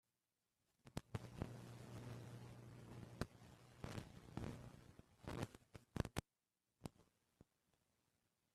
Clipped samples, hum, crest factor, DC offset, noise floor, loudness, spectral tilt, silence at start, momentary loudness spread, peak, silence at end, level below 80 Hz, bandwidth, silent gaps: under 0.1%; none; 32 dB; under 0.1%; under -90 dBFS; -54 LUFS; -6 dB/octave; 0.85 s; 11 LU; -22 dBFS; 1.1 s; -66 dBFS; 14 kHz; none